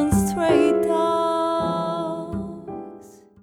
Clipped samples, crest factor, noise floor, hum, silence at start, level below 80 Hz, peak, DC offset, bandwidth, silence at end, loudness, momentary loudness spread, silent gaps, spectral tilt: under 0.1%; 16 dB; -45 dBFS; none; 0 s; -42 dBFS; -6 dBFS; under 0.1%; 18 kHz; 0.3 s; -22 LUFS; 17 LU; none; -6 dB/octave